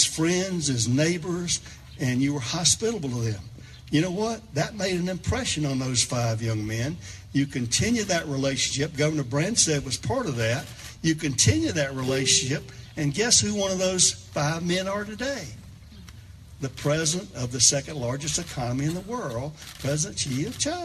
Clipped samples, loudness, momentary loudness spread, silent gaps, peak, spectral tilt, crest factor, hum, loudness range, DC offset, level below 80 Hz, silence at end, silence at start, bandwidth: under 0.1%; -25 LUFS; 11 LU; none; -4 dBFS; -3.5 dB/octave; 22 dB; none; 4 LU; under 0.1%; -48 dBFS; 0 s; 0 s; 13.5 kHz